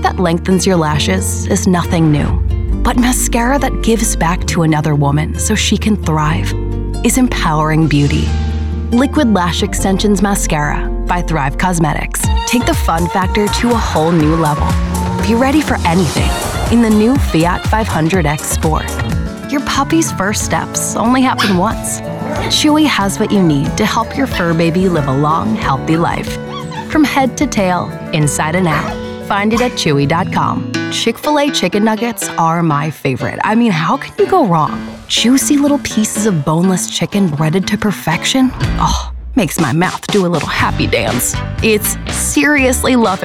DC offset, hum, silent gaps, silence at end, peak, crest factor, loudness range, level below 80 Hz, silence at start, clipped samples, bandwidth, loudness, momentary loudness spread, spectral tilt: 0.1%; none; none; 0 s; -2 dBFS; 10 dB; 2 LU; -24 dBFS; 0 s; under 0.1%; 16 kHz; -13 LUFS; 6 LU; -5 dB/octave